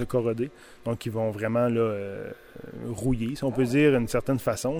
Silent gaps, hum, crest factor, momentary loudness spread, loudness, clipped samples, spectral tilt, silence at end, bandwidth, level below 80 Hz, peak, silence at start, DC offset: none; none; 16 dB; 16 LU; -27 LUFS; under 0.1%; -6.5 dB/octave; 0 s; 16.5 kHz; -46 dBFS; -10 dBFS; 0 s; under 0.1%